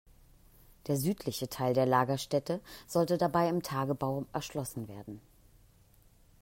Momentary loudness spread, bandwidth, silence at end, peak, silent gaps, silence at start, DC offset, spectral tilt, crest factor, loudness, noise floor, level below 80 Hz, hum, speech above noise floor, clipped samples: 15 LU; 16 kHz; 1.2 s; -14 dBFS; none; 0.85 s; under 0.1%; -6 dB/octave; 20 dB; -32 LUFS; -62 dBFS; -62 dBFS; none; 31 dB; under 0.1%